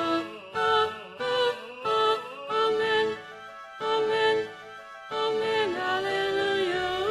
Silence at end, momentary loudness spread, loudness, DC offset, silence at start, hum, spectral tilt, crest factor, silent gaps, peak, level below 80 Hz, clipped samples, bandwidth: 0 s; 14 LU; -27 LUFS; under 0.1%; 0 s; none; -3.5 dB/octave; 16 dB; none; -12 dBFS; -64 dBFS; under 0.1%; 12.5 kHz